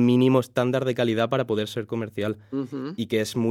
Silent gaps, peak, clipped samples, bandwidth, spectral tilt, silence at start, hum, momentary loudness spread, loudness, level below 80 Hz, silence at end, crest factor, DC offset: none; -6 dBFS; under 0.1%; 15.5 kHz; -6.5 dB/octave; 0 s; none; 11 LU; -25 LUFS; -70 dBFS; 0 s; 16 dB; under 0.1%